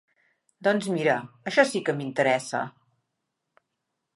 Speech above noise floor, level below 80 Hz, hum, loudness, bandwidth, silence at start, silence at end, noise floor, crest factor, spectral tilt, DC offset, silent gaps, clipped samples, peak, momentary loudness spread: 56 dB; -78 dBFS; none; -25 LUFS; 11.5 kHz; 0.6 s; 1.45 s; -81 dBFS; 22 dB; -4.5 dB/octave; under 0.1%; none; under 0.1%; -6 dBFS; 8 LU